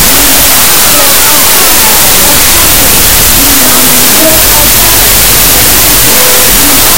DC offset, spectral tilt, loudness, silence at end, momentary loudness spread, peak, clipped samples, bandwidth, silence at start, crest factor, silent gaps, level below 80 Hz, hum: 20%; -1 dB/octave; -1 LUFS; 0 s; 0 LU; 0 dBFS; 20%; over 20 kHz; 0 s; 4 dB; none; -18 dBFS; none